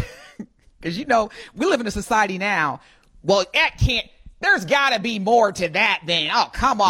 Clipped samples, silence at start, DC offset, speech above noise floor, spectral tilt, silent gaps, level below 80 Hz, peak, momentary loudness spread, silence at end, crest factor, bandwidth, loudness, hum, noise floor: under 0.1%; 0 s; under 0.1%; 21 dB; -4 dB/octave; none; -38 dBFS; -6 dBFS; 13 LU; 0 s; 16 dB; 16 kHz; -20 LUFS; none; -41 dBFS